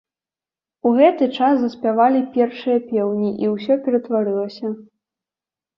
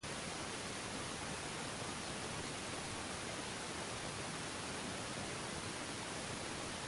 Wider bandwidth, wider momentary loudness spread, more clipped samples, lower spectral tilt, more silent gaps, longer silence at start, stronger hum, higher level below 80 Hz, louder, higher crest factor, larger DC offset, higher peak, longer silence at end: second, 6 kHz vs 11.5 kHz; first, 9 LU vs 0 LU; neither; first, -8.5 dB/octave vs -3 dB/octave; neither; first, 0.85 s vs 0 s; neither; second, -68 dBFS vs -62 dBFS; first, -19 LUFS vs -43 LUFS; about the same, 18 dB vs 14 dB; neither; first, -2 dBFS vs -30 dBFS; first, 0.95 s vs 0 s